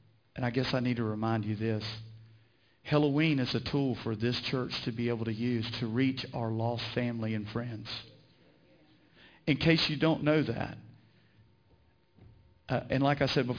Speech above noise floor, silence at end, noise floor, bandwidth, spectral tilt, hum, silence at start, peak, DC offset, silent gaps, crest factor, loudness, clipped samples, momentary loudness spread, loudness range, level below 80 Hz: 35 dB; 0 s; -66 dBFS; 5.4 kHz; -7 dB/octave; none; 0.35 s; -12 dBFS; under 0.1%; none; 20 dB; -31 LUFS; under 0.1%; 13 LU; 3 LU; -60 dBFS